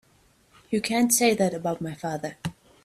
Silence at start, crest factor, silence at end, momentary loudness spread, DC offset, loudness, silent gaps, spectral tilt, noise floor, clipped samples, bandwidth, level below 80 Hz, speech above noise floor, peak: 0.7 s; 20 dB; 0.3 s; 14 LU; under 0.1%; -25 LUFS; none; -3.5 dB/octave; -61 dBFS; under 0.1%; 16 kHz; -62 dBFS; 37 dB; -6 dBFS